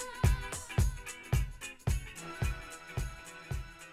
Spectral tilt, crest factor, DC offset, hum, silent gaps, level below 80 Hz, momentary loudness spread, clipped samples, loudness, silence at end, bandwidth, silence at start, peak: -5 dB/octave; 20 dB; under 0.1%; none; none; -38 dBFS; 12 LU; under 0.1%; -37 LUFS; 0 s; 15.5 kHz; 0 s; -14 dBFS